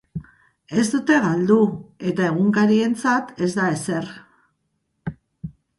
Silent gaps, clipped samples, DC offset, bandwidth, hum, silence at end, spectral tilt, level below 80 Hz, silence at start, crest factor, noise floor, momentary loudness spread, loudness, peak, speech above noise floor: none; under 0.1%; under 0.1%; 11.5 kHz; none; 0.3 s; -6 dB/octave; -56 dBFS; 0.15 s; 18 dB; -72 dBFS; 19 LU; -20 LUFS; -4 dBFS; 53 dB